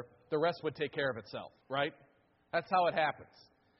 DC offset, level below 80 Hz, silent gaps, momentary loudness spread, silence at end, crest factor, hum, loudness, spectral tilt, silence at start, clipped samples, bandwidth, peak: under 0.1%; -74 dBFS; none; 13 LU; 0.55 s; 18 dB; none; -35 LUFS; -2.5 dB/octave; 0 s; under 0.1%; 5.8 kHz; -18 dBFS